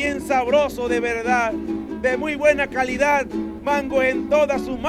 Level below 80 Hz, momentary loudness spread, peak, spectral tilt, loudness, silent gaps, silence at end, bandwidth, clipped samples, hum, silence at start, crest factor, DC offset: -44 dBFS; 6 LU; -4 dBFS; -4.5 dB/octave; -20 LUFS; none; 0 s; 14 kHz; under 0.1%; none; 0 s; 16 dB; under 0.1%